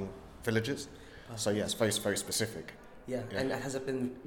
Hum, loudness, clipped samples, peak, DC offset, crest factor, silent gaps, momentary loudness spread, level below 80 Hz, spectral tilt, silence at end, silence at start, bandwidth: none; -34 LUFS; under 0.1%; -16 dBFS; under 0.1%; 20 dB; none; 15 LU; -60 dBFS; -4 dB/octave; 0 s; 0 s; 19 kHz